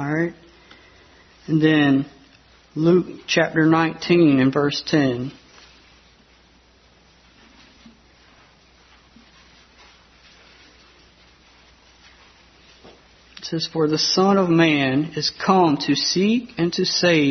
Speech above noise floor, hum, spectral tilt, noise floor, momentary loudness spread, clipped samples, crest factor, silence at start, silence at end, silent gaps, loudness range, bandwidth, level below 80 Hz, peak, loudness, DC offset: 36 dB; none; -5 dB/octave; -54 dBFS; 10 LU; under 0.1%; 20 dB; 0 s; 0 s; none; 10 LU; 6.4 kHz; -58 dBFS; -2 dBFS; -19 LUFS; under 0.1%